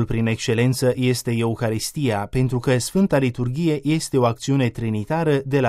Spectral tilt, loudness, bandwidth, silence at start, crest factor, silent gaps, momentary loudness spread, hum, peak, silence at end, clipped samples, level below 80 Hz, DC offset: -6 dB/octave; -21 LUFS; 15 kHz; 0 s; 16 dB; none; 4 LU; none; -4 dBFS; 0 s; under 0.1%; -44 dBFS; under 0.1%